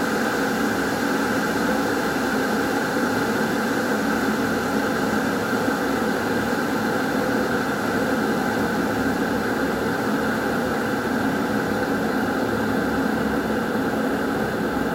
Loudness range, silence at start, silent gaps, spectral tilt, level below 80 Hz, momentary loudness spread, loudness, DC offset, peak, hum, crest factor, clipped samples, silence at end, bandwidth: 1 LU; 0 s; none; -5 dB/octave; -46 dBFS; 1 LU; -23 LUFS; under 0.1%; -10 dBFS; none; 14 dB; under 0.1%; 0 s; 16 kHz